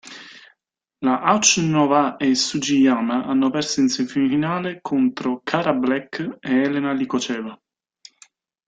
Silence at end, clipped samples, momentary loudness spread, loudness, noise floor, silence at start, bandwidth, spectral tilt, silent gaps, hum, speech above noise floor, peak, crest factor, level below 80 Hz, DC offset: 1.15 s; under 0.1%; 10 LU; -20 LUFS; -75 dBFS; 0.05 s; 9.4 kHz; -3.5 dB/octave; none; none; 55 dB; 0 dBFS; 20 dB; -62 dBFS; under 0.1%